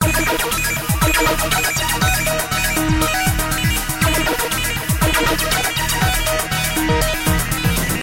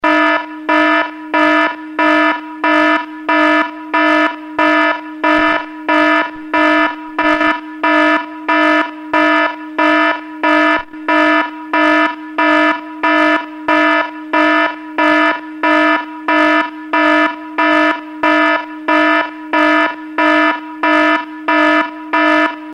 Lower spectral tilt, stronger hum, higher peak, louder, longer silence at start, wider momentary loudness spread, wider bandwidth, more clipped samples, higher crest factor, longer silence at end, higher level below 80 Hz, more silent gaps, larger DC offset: about the same, -3.5 dB/octave vs -3.5 dB/octave; neither; about the same, -2 dBFS vs 0 dBFS; second, -17 LUFS vs -13 LUFS; about the same, 0 s vs 0.05 s; second, 3 LU vs 6 LU; first, 17 kHz vs 9.2 kHz; neither; about the same, 16 dB vs 12 dB; about the same, 0 s vs 0 s; first, -26 dBFS vs -54 dBFS; neither; neither